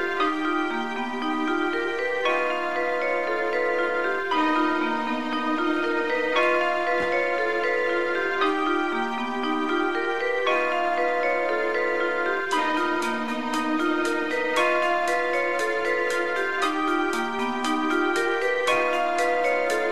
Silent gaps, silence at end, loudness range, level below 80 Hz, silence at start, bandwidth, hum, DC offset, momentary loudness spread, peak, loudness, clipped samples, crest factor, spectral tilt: none; 0 s; 1 LU; -62 dBFS; 0 s; 13.5 kHz; none; 1%; 4 LU; -10 dBFS; -24 LUFS; under 0.1%; 14 dB; -3 dB/octave